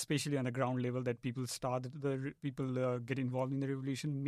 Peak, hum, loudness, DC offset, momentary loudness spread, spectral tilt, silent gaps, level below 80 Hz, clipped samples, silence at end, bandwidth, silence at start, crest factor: -20 dBFS; none; -38 LUFS; under 0.1%; 4 LU; -6 dB/octave; none; -72 dBFS; under 0.1%; 0 s; 14 kHz; 0 s; 16 dB